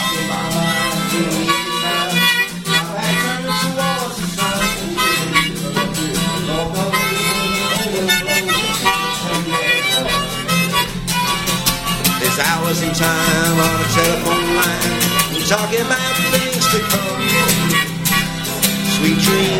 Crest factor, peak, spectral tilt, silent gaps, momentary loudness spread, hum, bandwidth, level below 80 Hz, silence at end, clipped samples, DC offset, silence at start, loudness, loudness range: 18 dB; 0 dBFS; -3 dB/octave; none; 5 LU; none; 16.5 kHz; -38 dBFS; 0 s; under 0.1%; under 0.1%; 0 s; -16 LUFS; 2 LU